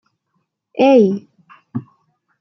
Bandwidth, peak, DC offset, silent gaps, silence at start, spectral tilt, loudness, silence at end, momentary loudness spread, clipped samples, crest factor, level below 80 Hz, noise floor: 6.4 kHz; -2 dBFS; under 0.1%; none; 0.75 s; -7.5 dB/octave; -14 LUFS; 0.6 s; 19 LU; under 0.1%; 16 dB; -66 dBFS; -70 dBFS